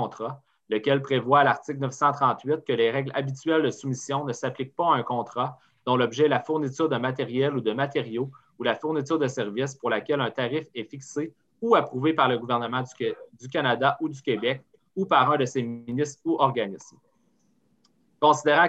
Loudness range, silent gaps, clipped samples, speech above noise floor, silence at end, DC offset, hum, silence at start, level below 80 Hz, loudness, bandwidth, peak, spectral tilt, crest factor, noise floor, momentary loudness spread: 3 LU; none; under 0.1%; 42 dB; 0 s; under 0.1%; none; 0 s; -72 dBFS; -26 LUFS; 8.4 kHz; -6 dBFS; -5.5 dB/octave; 18 dB; -67 dBFS; 11 LU